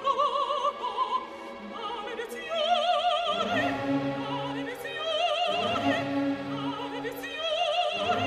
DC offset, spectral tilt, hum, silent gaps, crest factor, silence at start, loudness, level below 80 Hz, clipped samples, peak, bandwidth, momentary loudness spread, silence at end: under 0.1%; -4.5 dB/octave; none; none; 16 dB; 0 s; -29 LUFS; -64 dBFS; under 0.1%; -14 dBFS; 15 kHz; 9 LU; 0 s